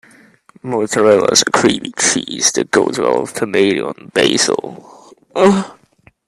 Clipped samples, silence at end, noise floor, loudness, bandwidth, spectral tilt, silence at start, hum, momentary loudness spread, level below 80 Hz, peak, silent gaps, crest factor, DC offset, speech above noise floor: under 0.1%; 0.55 s; -51 dBFS; -14 LUFS; 13.5 kHz; -3 dB/octave; 0.65 s; none; 11 LU; -56 dBFS; 0 dBFS; none; 16 dB; under 0.1%; 37 dB